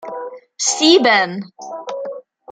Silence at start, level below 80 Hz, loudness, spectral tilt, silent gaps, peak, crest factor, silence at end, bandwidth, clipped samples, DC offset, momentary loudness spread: 0 s; -66 dBFS; -14 LUFS; -2 dB/octave; none; -2 dBFS; 18 dB; 0.3 s; 10 kHz; under 0.1%; under 0.1%; 20 LU